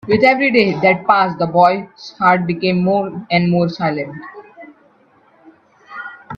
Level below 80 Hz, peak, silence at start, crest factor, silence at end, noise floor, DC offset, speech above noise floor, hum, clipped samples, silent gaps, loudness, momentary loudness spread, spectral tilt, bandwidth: -56 dBFS; 0 dBFS; 0.05 s; 16 dB; 0 s; -52 dBFS; under 0.1%; 38 dB; none; under 0.1%; none; -15 LUFS; 19 LU; -7.5 dB/octave; 6.6 kHz